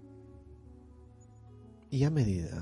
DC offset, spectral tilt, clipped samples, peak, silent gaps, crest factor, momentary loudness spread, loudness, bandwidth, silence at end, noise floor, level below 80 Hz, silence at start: under 0.1%; -8 dB/octave; under 0.1%; -16 dBFS; none; 20 dB; 26 LU; -31 LUFS; 11 kHz; 0 s; -55 dBFS; -54 dBFS; 0 s